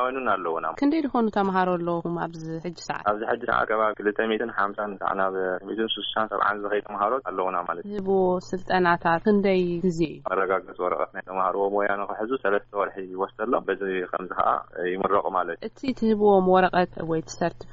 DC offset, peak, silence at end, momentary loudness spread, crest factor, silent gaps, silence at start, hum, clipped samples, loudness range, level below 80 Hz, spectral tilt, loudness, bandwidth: under 0.1%; -8 dBFS; 0 s; 8 LU; 18 dB; none; 0 s; none; under 0.1%; 3 LU; -54 dBFS; -4 dB/octave; -25 LUFS; 7.6 kHz